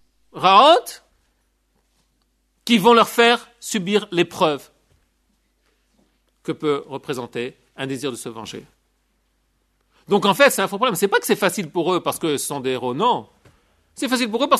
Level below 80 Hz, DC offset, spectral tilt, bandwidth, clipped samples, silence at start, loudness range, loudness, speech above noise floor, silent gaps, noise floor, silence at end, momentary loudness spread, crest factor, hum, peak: -64 dBFS; under 0.1%; -3.5 dB/octave; 13.5 kHz; under 0.1%; 0.35 s; 11 LU; -19 LUFS; 48 dB; none; -66 dBFS; 0 s; 18 LU; 20 dB; none; -2 dBFS